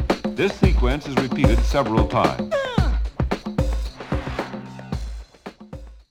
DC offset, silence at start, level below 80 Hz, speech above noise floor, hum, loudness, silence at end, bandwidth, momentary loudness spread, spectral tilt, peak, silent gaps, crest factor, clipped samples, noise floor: under 0.1%; 0 s; -26 dBFS; 22 dB; none; -22 LUFS; 0.1 s; 12 kHz; 19 LU; -6.5 dB/octave; -2 dBFS; none; 20 dB; under 0.1%; -41 dBFS